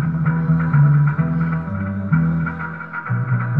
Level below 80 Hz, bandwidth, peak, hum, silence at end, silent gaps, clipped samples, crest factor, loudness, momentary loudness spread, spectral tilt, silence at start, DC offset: -42 dBFS; 3 kHz; -6 dBFS; none; 0 s; none; under 0.1%; 12 dB; -19 LUFS; 10 LU; -12 dB/octave; 0 s; 0.4%